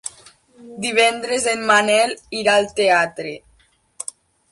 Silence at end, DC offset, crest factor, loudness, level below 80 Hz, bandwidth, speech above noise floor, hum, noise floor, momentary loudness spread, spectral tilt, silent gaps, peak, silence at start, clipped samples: 1.15 s; under 0.1%; 16 dB; -17 LUFS; -60 dBFS; 11.5 kHz; 40 dB; none; -58 dBFS; 17 LU; -2 dB/octave; none; -4 dBFS; 0.05 s; under 0.1%